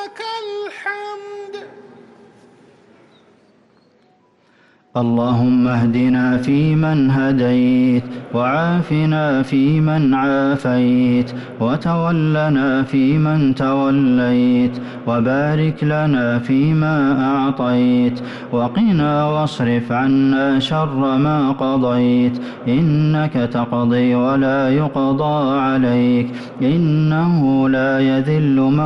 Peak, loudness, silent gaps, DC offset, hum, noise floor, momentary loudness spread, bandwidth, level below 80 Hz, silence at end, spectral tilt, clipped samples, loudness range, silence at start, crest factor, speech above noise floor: -8 dBFS; -16 LUFS; none; under 0.1%; none; -55 dBFS; 7 LU; 6.4 kHz; -48 dBFS; 0 s; -8.5 dB/octave; under 0.1%; 3 LU; 0 s; 8 dB; 40 dB